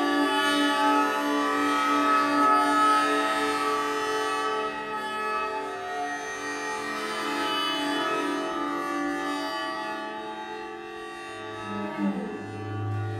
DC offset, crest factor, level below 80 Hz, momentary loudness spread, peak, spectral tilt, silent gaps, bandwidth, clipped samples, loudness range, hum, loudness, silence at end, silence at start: under 0.1%; 16 dB; -66 dBFS; 14 LU; -12 dBFS; -4 dB/octave; none; 16 kHz; under 0.1%; 10 LU; none; -26 LUFS; 0 s; 0 s